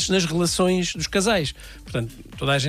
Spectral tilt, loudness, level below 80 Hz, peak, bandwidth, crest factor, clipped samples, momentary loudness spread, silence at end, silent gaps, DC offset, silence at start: -4 dB/octave; -23 LUFS; -42 dBFS; -8 dBFS; 15.5 kHz; 14 dB; under 0.1%; 10 LU; 0 s; none; under 0.1%; 0 s